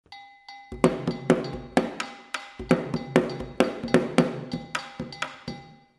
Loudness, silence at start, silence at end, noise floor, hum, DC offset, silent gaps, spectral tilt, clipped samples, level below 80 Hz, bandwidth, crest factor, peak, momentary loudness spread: -27 LUFS; 0.1 s; 0.25 s; -47 dBFS; none; under 0.1%; none; -6 dB/octave; under 0.1%; -52 dBFS; 12.5 kHz; 28 dB; 0 dBFS; 17 LU